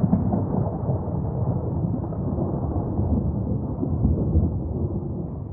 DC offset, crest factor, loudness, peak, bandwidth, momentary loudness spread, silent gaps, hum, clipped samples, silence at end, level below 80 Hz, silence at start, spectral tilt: under 0.1%; 18 dB; -25 LUFS; -6 dBFS; 1.9 kHz; 5 LU; none; none; under 0.1%; 0 s; -34 dBFS; 0 s; -16.5 dB/octave